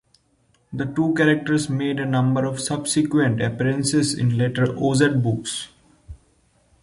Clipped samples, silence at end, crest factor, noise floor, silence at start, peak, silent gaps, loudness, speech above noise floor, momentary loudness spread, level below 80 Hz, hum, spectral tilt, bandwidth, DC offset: under 0.1%; 0.65 s; 18 dB; -63 dBFS; 0.7 s; -4 dBFS; none; -21 LUFS; 42 dB; 8 LU; -52 dBFS; none; -5.5 dB/octave; 11.5 kHz; under 0.1%